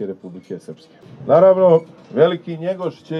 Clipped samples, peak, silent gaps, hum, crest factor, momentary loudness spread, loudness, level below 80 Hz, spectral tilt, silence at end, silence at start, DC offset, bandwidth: under 0.1%; -2 dBFS; none; none; 16 dB; 22 LU; -16 LUFS; -68 dBFS; -8.5 dB/octave; 0 s; 0 s; under 0.1%; 6.2 kHz